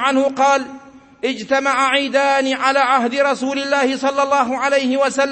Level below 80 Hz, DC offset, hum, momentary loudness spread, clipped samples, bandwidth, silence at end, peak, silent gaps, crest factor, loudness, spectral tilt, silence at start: -64 dBFS; under 0.1%; none; 5 LU; under 0.1%; 8.8 kHz; 0 s; -2 dBFS; none; 14 dB; -17 LUFS; -2.5 dB/octave; 0 s